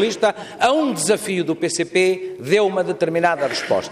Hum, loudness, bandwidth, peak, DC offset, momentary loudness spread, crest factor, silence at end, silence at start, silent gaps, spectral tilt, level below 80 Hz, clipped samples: none; -19 LUFS; 15.5 kHz; -4 dBFS; under 0.1%; 4 LU; 14 dB; 0 s; 0 s; none; -4 dB/octave; -62 dBFS; under 0.1%